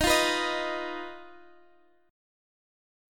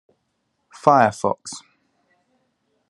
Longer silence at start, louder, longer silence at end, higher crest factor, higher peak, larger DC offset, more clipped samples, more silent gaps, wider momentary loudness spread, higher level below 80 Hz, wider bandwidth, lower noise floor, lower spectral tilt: second, 0 s vs 0.85 s; second, -28 LUFS vs -19 LUFS; first, 1.75 s vs 1.3 s; about the same, 20 dB vs 24 dB; second, -12 dBFS vs 0 dBFS; neither; neither; neither; about the same, 19 LU vs 20 LU; first, -50 dBFS vs -70 dBFS; first, 17.5 kHz vs 11.5 kHz; second, -63 dBFS vs -72 dBFS; second, -2 dB/octave vs -5 dB/octave